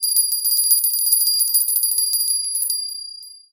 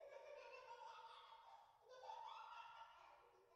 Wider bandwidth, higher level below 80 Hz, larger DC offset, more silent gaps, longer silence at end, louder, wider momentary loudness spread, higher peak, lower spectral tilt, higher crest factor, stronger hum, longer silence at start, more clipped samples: first, 17.5 kHz vs 7.6 kHz; first, -78 dBFS vs under -90 dBFS; neither; neither; first, 0.15 s vs 0 s; first, -16 LUFS vs -61 LUFS; first, 13 LU vs 10 LU; first, -2 dBFS vs -44 dBFS; second, 7 dB/octave vs 2 dB/octave; about the same, 18 dB vs 18 dB; neither; about the same, 0 s vs 0 s; neither